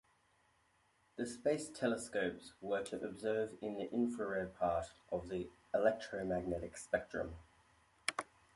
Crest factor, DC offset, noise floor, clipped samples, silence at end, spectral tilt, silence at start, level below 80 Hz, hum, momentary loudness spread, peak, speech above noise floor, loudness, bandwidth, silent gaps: 24 dB; under 0.1%; -75 dBFS; under 0.1%; 0.3 s; -5 dB/octave; 1.15 s; -64 dBFS; none; 8 LU; -18 dBFS; 36 dB; -40 LUFS; 11.5 kHz; none